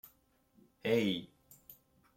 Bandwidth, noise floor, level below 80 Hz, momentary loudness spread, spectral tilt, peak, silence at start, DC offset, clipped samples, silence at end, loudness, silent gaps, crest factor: 16.5 kHz; -71 dBFS; -76 dBFS; 25 LU; -5.5 dB/octave; -18 dBFS; 0.85 s; under 0.1%; under 0.1%; 0.45 s; -34 LUFS; none; 22 dB